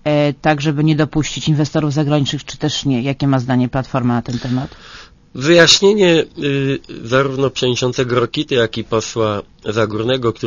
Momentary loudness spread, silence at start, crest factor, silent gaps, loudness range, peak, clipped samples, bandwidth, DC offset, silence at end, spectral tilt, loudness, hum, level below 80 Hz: 10 LU; 0.05 s; 16 dB; none; 4 LU; 0 dBFS; under 0.1%; 11 kHz; under 0.1%; 0 s; -5 dB/octave; -16 LUFS; none; -42 dBFS